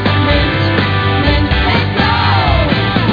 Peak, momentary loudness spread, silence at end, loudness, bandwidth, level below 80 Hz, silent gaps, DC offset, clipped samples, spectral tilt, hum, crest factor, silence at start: 0 dBFS; 2 LU; 0 s; -12 LUFS; 5.2 kHz; -22 dBFS; none; under 0.1%; under 0.1%; -8 dB/octave; none; 12 dB; 0 s